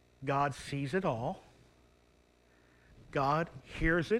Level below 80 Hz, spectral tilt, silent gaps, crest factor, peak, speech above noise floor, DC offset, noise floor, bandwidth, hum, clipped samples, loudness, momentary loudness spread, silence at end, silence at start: -50 dBFS; -6.5 dB/octave; none; 18 dB; -16 dBFS; 34 dB; under 0.1%; -67 dBFS; 12.5 kHz; 60 Hz at -70 dBFS; under 0.1%; -34 LUFS; 9 LU; 0 s; 0.2 s